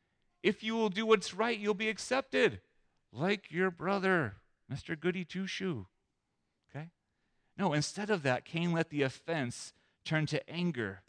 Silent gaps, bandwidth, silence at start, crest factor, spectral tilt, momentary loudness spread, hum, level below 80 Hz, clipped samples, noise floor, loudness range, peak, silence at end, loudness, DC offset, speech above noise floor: none; 10.5 kHz; 0.45 s; 20 dB; -5 dB/octave; 16 LU; none; -72 dBFS; under 0.1%; -82 dBFS; 6 LU; -14 dBFS; 0.1 s; -33 LUFS; under 0.1%; 49 dB